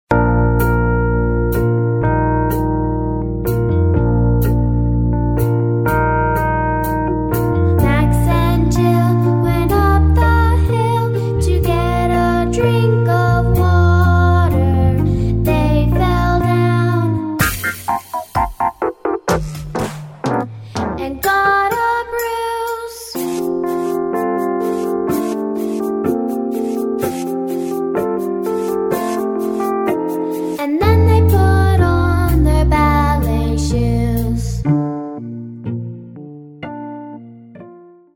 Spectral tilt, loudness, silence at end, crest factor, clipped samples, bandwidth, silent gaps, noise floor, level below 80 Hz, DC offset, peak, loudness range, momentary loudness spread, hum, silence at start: -7.5 dB/octave; -16 LUFS; 0.35 s; 14 dB; under 0.1%; 17.5 kHz; none; -41 dBFS; -24 dBFS; under 0.1%; 0 dBFS; 6 LU; 9 LU; none; 0.1 s